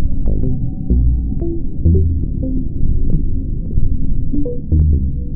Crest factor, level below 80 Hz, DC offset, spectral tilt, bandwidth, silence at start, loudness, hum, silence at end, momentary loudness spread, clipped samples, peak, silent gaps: 12 dB; -16 dBFS; under 0.1%; -17.5 dB/octave; 0.8 kHz; 0 s; -19 LUFS; none; 0 s; 7 LU; under 0.1%; -2 dBFS; none